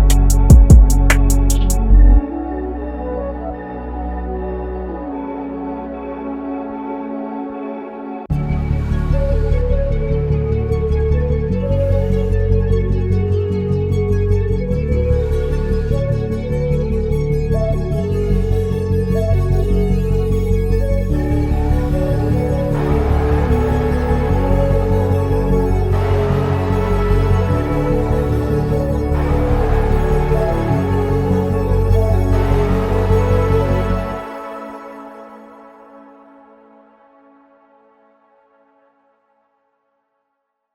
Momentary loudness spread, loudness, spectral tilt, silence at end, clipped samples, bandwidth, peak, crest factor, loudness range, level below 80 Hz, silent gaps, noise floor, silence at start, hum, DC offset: 11 LU; -17 LUFS; -7.5 dB/octave; 4.75 s; under 0.1%; 15 kHz; 0 dBFS; 16 dB; 9 LU; -18 dBFS; none; -73 dBFS; 0 s; none; under 0.1%